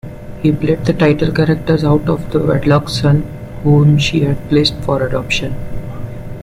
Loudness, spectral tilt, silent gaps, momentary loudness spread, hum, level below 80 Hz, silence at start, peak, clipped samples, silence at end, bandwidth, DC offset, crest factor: -14 LUFS; -7 dB/octave; none; 15 LU; none; -32 dBFS; 0.05 s; -2 dBFS; under 0.1%; 0 s; 12 kHz; under 0.1%; 12 dB